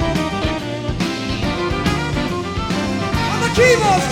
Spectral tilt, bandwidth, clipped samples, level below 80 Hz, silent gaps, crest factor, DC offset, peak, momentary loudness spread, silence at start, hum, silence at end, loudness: -5 dB/octave; 17 kHz; under 0.1%; -32 dBFS; none; 16 dB; under 0.1%; -2 dBFS; 9 LU; 0 s; none; 0 s; -18 LUFS